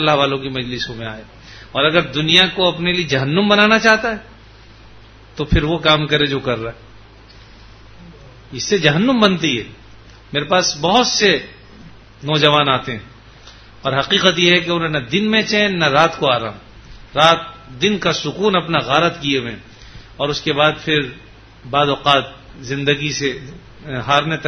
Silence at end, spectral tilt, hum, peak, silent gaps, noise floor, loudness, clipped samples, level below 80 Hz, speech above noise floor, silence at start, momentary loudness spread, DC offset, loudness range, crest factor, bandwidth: 0 s; -4 dB/octave; none; 0 dBFS; none; -42 dBFS; -16 LUFS; under 0.1%; -40 dBFS; 26 dB; 0 s; 16 LU; under 0.1%; 5 LU; 18 dB; 11 kHz